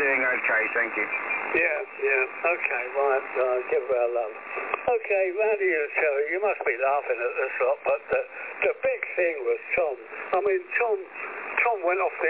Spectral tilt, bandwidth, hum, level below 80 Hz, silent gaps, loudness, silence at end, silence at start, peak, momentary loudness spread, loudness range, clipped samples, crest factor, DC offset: -7 dB/octave; 4 kHz; none; -68 dBFS; none; -25 LUFS; 0 s; 0 s; -10 dBFS; 6 LU; 2 LU; under 0.1%; 16 dB; under 0.1%